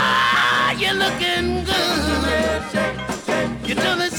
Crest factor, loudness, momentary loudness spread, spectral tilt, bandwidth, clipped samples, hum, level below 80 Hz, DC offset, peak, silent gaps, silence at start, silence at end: 14 dB; -19 LUFS; 7 LU; -3.5 dB/octave; 19.5 kHz; under 0.1%; none; -36 dBFS; under 0.1%; -6 dBFS; none; 0 s; 0 s